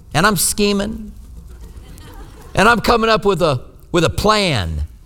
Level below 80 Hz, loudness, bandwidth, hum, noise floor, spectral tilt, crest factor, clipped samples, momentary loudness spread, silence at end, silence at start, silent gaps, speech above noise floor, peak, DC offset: -32 dBFS; -16 LUFS; over 20 kHz; none; -36 dBFS; -4 dB/octave; 18 dB; under 0.1%; 12 LU; 0.1 s; 0.1 s; none; 20 dB; 0 dBFS; under 0.1%